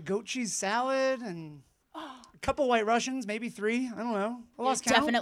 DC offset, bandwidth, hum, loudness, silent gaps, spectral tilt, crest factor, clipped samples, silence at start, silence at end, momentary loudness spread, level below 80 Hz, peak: under 0.1%; 16 kHz; none; -30 LUFS; none; -3 dB/octave; 22 dB; under 0.1%; 0 s; 0 s; 19 LU; -60 dBFS; -8 dBFS